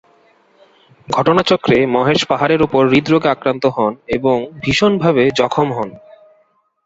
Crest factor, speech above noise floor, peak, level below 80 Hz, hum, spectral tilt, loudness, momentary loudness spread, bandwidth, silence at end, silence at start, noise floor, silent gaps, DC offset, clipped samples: 14 dB; 44 dB; -2 dBFS; -46 dBFS; none; -6 dB/octave; -15 LUFS; 6 LU; 8 kHz; 0.9 s; 1.1 s; -58 dBFS; none; under 0.1%; under 0.1%